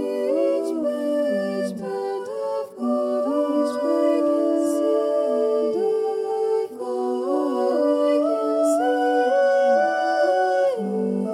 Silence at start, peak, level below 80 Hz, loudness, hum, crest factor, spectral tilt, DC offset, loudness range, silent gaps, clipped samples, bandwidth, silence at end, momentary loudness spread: 0 s; -8 dBFS; -80 dBFS; -22 LUFS; none; 12 dB; -5.5 dB/octave; under 0.1%; 4 LU; none; under 0.1%; 14.5 kHz; 0 s; 8 LU